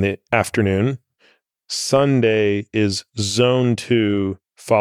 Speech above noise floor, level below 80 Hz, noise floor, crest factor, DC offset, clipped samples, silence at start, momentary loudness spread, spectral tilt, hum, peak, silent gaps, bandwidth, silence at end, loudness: 41 dB; -56 dBFS; -59 dBFS; 18 dB; under 0.1%; under 0.1%; 0 s; 8 LU; -5.5 dB/octave; none; -2 dBFS; none; 15.5 kHz; 0 s; -19 LUFS